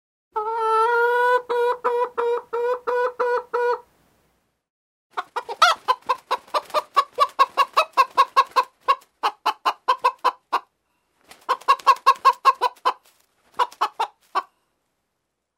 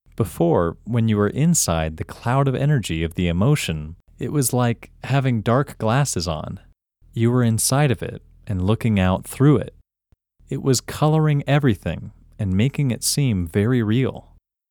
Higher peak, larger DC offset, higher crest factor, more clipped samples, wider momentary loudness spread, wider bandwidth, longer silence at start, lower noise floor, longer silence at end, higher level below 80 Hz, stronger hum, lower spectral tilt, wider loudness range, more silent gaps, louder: first, 0 dBFS vs -4 dBFS; neither; first, 22 dB vs 16 dB; neither; about the same, 11 LU vs 12 LU; second, 16 kHz vs 19 kHz; first, 0.35 s vs 0.2 s; first, -78 dBFS vs -64 dBFS; first, 1.15 s vs 0.5 s; second, -76 dBFS vs -42 dBFS; neither; second, 0 dB/octave vs -5.5 dB/octave; about the same, 4 LU vs 2 LU; first, 4.70-5.10 s vs none; about the same, -22 LUFS vs -20 LUFS